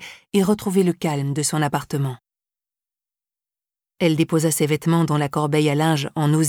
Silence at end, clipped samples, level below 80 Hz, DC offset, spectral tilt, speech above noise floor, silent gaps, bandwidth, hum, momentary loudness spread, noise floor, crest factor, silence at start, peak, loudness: 0 s; under 0.1%; -60 dBFS; under 0.1%; -5.5 dB/octave; over 71 dB; none; 18 kHz; none; 5 LU; under -90 dBFS; 16 dB; 0 s; -6 dBFS; -21 LUFS